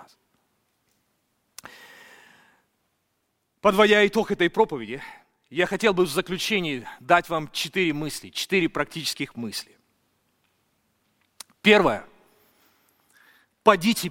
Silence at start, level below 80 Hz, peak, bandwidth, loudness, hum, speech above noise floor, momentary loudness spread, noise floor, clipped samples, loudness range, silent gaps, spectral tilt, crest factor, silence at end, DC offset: 3.65 s; -56 dBFS; -2 dBFS; 17 kHz; -23 LUFS; none; 52 dB; 17 LU; -74 dBFS; under 0.1%; 7 LU; none; -4 dB/octave; 24 dB; 0 s; under 0.1%